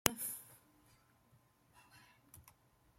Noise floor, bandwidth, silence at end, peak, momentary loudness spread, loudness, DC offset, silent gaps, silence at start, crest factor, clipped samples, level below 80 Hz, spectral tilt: -71 dBFS; 16.5 kHz; 0.6 s; -4 dBFS; 24 LU; -41 LUFS; under 0.1%; none; 0.05 s; 42 dB; under 0.1%; -72 dBFS; -2 dB/octave